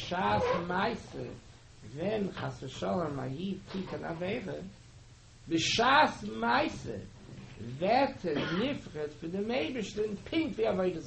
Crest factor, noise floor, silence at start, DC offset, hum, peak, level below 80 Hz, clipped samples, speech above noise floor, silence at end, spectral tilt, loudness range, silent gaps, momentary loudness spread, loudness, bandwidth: 22 dB; -55 dBFS; 0 s; under 0.1%; none; -12 dBFS; -56 dBFS; under 0.1%; 22 dB; 0 s; -5 dB/octave; 7 LU; none; 16 LU; -32 LUFS; 8.4 kHz